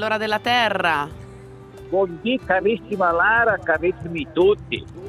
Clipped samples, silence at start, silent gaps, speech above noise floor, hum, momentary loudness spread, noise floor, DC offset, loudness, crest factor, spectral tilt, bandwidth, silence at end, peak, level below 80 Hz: under 0.1%; 0 s; none; 20 dB; none; 11 LU; -40 dBFS; under 0.1%; -20 LUFS; 16 dB; -5.5 dB/octave; 13 kHz; 0 s; -6 dBFS; -48 dBFS